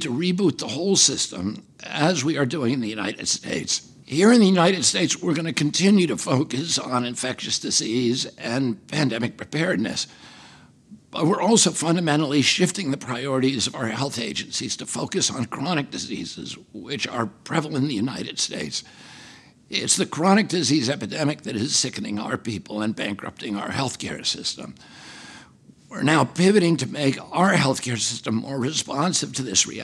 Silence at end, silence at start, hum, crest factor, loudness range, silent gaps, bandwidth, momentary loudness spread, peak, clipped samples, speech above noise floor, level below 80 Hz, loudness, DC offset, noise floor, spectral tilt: 0 s; 0 s; none; 20 dB; 7 LU; none; 13 kHz; 12 LU; -4 dBFS; under 0.1%; 28 dB; -64 dBFS; -22 LUFS; under 0.1%; -51 dBFS; -3.5 dB/octave